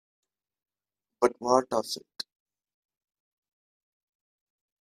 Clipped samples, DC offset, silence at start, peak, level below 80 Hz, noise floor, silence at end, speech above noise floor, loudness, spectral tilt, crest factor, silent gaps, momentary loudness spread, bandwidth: under 0.1%; under 0.1%; 1.2 s; -8 dBFS; -76 dBFS; under -90 dBFS; 2.65 s; over 63 dB; -28 LUFS; -3.5 dB/octave; 26 dB; none; 16 LU; 14 kHz